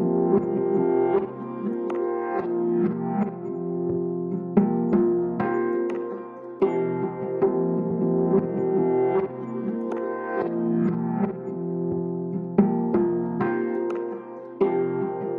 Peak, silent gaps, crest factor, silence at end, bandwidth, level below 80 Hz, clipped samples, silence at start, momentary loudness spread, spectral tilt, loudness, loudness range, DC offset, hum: -6 dBFS; none; 18 dB; 0 s; 3.7 kHz; -62 dBFS; under 0.1%; 0 s; 8 LU; -11 dB/octave; -25 LUFS; 2 LU; under 0.1%; none